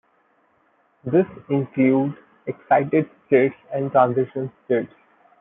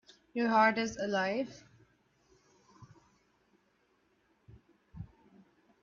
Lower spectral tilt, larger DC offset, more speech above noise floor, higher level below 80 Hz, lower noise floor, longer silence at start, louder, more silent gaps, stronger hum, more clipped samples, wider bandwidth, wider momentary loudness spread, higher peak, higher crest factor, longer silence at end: first, -12.5 dB/octave vs -3 dB/octave; neither; about the same, 42 dB vs 43 dB; about the same, -68 dBFS vs -68 dBFS; second, -63 dBFS vs -73 dBFS; first, 1.05 s vs 0.35 s; first, -21 LUFS vs -31 LUFS; neither; neither; neither; second, 3.8 kHz vs 7.2 kHz; second, 15 LU vs 24 LU; first, -4 dBFS vs -14 dBFS; second, 18 dB vs 24 dB; second, 0.55 s vs 0.75 s